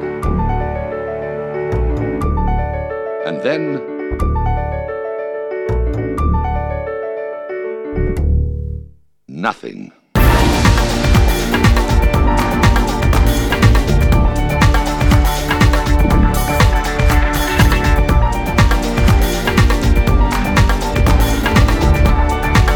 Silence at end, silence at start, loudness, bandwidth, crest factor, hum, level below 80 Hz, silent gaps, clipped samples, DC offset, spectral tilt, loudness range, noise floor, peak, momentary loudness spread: 0 s; 0 s; -15 LUFS; 19 kHz; 14 dB; none; -16 dBFS; none; under 0.1%; under 0.1%; -6 dB/octave; 7 LU; -40 dBFS; 0 dBFS; 10 LU